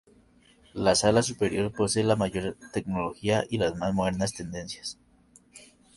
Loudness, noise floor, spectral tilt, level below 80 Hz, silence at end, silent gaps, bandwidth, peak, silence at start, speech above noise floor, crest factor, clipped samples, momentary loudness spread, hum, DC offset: -27 LUFS; -59 dBFS; -4.5 dB/octave; -52 dBFS; 0.35 s; none; 11.5 kHz; -8 dBFS; 0.75 s; 33 dB; 20 dB; under 0.1%; 13 LU; none; under 0.1%